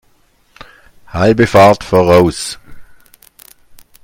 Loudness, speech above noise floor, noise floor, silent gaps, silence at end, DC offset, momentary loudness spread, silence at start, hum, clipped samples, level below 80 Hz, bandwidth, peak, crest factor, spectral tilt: -10 LUFS; 44 dB; -53 dBFS; none; 1.2 s; under 0.1%; 17 LU; 1.15 s; none; 0.2%; -40 dBFS; 17 kHz; 0 dBFS; 14 dB; -6 dB/octave